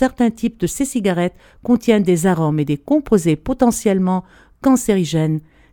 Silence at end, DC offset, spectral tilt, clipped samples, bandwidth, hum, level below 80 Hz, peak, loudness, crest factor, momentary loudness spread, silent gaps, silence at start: 0.35 s; under 0.1%; -6 dB/octave; under 0.1%; 18.5 kHz; none; -42 dBFS; 0 dBFS; -17 LUFS; 16 dB; 6 LU; none; 0 s